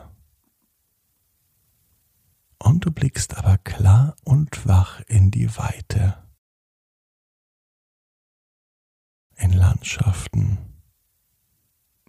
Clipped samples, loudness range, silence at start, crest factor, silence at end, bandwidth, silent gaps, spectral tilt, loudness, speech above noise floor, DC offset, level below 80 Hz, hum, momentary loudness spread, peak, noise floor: under 0.1%; 10 LU; 2.6 s; 16 dB; 1.4 s; 12.5 kHz; 6.38-9.30 s; -6.5 dB/octave; -20 LUFS; 51 dB; under 0.1%; -38 dBFS; none; 8 LU; -4 dBFS; -69 dBFS